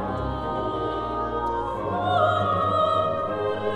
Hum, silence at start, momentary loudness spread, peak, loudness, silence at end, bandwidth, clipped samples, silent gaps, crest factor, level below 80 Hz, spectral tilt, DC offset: none; 0 s; 7 LU; -8 dBFS; -25 LUFS; 0 s; 9.8 kHz; under 0.1%; none; 16 dB; -42 dBFS; -7 dB/octave; under 0.1%